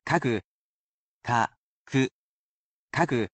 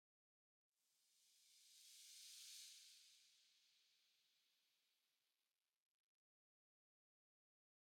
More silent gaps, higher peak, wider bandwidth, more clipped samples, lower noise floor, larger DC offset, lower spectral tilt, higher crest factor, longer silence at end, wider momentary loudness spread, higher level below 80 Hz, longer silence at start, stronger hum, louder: first, 0.44-1.21 s, 1.57-1.85 s, 2.11-2.88 s vs none; first, -10 dBFS vs -48 dBFS; second, 9 kHz vs 17.5 kHz; neither; about the same, under -90 dBFS vs under -90 dBFS; neither; first, -6 dB/octave vs 5 dB/octave; about the same, 20 dB vs 22 dB; second, 0.05 s vs 2.5 s; second, 7 LU vs 10 LU; first, -62 dBFS vs under -90 dBFS; second, 0.05 s vs 0.75 s; neither; first, -28 LUFS vs -61 LUFS